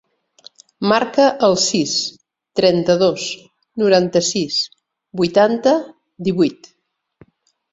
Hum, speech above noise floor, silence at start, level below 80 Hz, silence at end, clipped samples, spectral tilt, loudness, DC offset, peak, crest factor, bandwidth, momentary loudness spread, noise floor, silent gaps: none; 40 dB; 0.8 s; -60 dBFS; 1.2 s; under 0.1%; -4 dB/octave; -17 LUFS; under 0.1%; -2 dBFS; 16 dB; 8 kHz; 13 LU; -56 dBFS; none